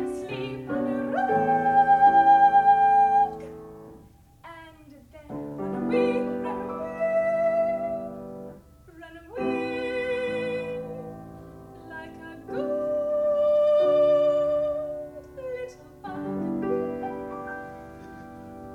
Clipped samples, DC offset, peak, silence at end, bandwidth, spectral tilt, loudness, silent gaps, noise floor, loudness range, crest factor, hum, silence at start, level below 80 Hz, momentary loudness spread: under 0.1%; under 0.1%; -10 dBFS; 0 s; 10 kHz; -7 dB/octave; -24 LUFS; none; -52 dBFS; 12 LU; 16 dB; none; 0 s; -58 dBFS; 24 LU